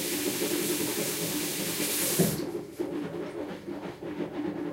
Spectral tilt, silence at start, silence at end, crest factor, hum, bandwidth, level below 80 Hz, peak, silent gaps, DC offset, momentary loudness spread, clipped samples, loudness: -3.5 dB/octave; 0 s; 0 s; 20 dB; none; 16 kHz; -62 dBFS; -12 dBFS; none; under 0.1%; 12 LU; under 0.1%; -30 LUFS